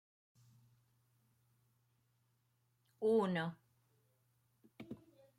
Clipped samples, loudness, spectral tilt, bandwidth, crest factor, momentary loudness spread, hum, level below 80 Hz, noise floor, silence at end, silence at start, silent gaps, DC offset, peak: under 0.1%; -37 LUFS; -7.5 dB/octave; 13 kHz; 20 dB; 21 LU; none; -86 dBFS; -80 dBFS; 0.4 s; 3 s; none; under 0.1%; -24 dBFS